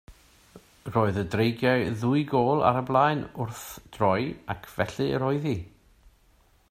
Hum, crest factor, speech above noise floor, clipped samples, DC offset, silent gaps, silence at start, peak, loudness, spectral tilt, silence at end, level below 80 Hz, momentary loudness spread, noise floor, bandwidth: none; 22 dB; 36 dB; under 0.1%; under 0.1%; none; 0.1 s; -6 dBFS; -26 LUFS; -7 dB/octave; 1.05 s; -56 dBFS; 12 LU; -61 dBFS; 16 kHz